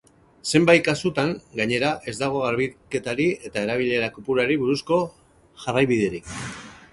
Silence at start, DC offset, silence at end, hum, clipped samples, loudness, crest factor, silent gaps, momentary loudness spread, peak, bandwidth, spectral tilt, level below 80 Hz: 0.45 s; under 0.1%; 0.2 s; none; under 0.1%; -23 LUFS; 20 dB; none; 14 LU; -2 dBFS; 11.5 kHz; -5 dB/octave; -54 dBFS